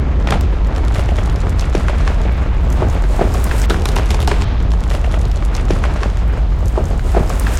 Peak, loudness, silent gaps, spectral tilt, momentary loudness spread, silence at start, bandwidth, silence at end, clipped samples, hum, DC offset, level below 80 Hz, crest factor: 0 dBFS; -17 LUFS; none; -6.5 dB/octave; 2 LU; 0 s; 13 kHz; 0 s; under 0.1%; none; under 0.1%; -14 dBFS; 12 dB